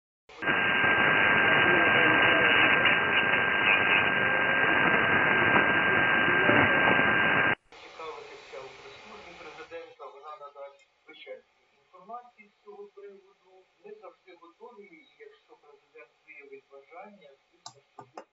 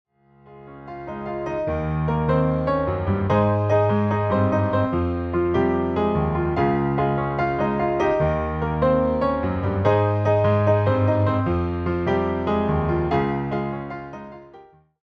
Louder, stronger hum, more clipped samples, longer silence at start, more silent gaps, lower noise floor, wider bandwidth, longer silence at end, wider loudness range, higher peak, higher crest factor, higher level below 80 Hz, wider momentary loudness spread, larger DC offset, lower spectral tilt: about the same, -22 LUFS vs -22 LUFS; neither; neither; second, 0.35 s vs 0.5 s; neither; first, -68 dBFS vs -50 dBFS; first, 7.8 kHz vs 6.2 kHz; second, 0.1 s vs 0.4 s; first, 23 LU vs 3 LU; about the same, -6 dBFS vs -6 dBFS; about the same, 20 dB vs 16 dB; second, -62 dBFS vs -40 dBFS; first, 24 LU vs 9 LU; neither; second, -5.5 dB/octave vs -9.5 dB/octave